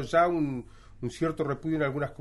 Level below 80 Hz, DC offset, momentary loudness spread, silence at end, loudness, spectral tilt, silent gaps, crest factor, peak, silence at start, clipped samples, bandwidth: -52 dBFS; under 0.1%; 14 LU; 0.05 s; -29 LUFS; -7 dB/octave; none; 18 dB; -12 dBFS; 0 s; under 0.1%; 11.5 kHz